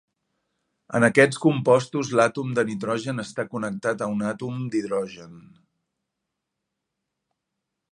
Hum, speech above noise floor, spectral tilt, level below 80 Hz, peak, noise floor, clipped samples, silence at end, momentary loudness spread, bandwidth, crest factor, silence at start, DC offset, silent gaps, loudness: none; 59 dB; -6 dB/octave; -68 dBFS; -2 dBFS; -82 dBFS; under 0.1%; 2.5 s; 12 LU; 11 kHz; 24 dB; 0.9 s; under 0.1%; none; -23 LUFS